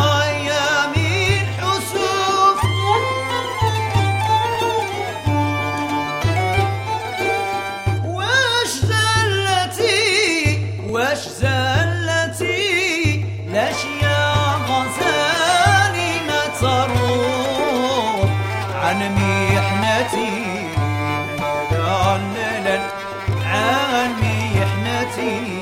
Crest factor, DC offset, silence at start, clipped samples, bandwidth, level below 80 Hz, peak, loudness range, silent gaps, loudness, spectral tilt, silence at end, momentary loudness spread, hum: 16 dB; under 0.1%; 0 s; under 0.1%; 16 kHz; -40 dBFS; -2 dBFS; 3 LU; none; -18 LUFS; -4.5 dB/octave; 0 s; 7 LU; none